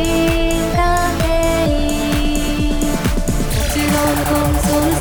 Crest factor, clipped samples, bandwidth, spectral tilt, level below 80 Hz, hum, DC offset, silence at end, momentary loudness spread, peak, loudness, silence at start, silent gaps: 14 dB; under 0.1%; over 20 kHz; -5 dB/octave; -20 dBFS; none; under 0.1%; 0 s; 3 LU; -2 dBFS; -17 LUFS; 0 s; none